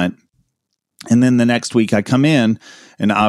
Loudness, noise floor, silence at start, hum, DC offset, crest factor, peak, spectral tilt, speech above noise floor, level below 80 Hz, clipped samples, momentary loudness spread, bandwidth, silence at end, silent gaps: -15 LUFS; -75 dBFS; 0 s; none; under 0.1%; 14 dB; -2 dBFS; -6 dB/octave; 60 dB; -54 dBFS; under 0.1%; 8 LU; 12 kHz; 0 s; none